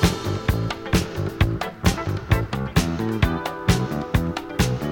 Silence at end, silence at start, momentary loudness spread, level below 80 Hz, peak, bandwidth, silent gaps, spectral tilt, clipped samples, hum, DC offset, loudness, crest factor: 0 s; 0 s; 3 LU; -30 dBFS; -4 dBFS; 18.5 kHz; none; -5.5 dB/octave; under 0.1%; none; under 0.1%; -23 LUFS; 18 dB